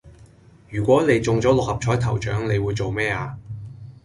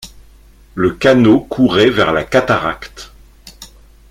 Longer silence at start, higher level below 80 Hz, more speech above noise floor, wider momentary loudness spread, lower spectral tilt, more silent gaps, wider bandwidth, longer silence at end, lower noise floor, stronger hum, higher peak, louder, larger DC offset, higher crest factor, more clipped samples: about the same, 0.05 s vs 0 s; about the same, -42 dBFS vs -40 dBFS; about the same, 29 dB vs 31 dB; about the same, 17 LU vs 19 LU; about the same, -6.5 dB/octave vs -6 dB/octave; neither; second, 11.5 kHz vs 15.5 kHz; second, 0.15 s vs 0.45 s; first, -49 dBFS vs -43 dBFS; neither; second, -4 dBFS vs 0 dBFS; second, -21 LUFS vs -13 LUFS; neither; about the same, 18 dB vs 14 dB; neither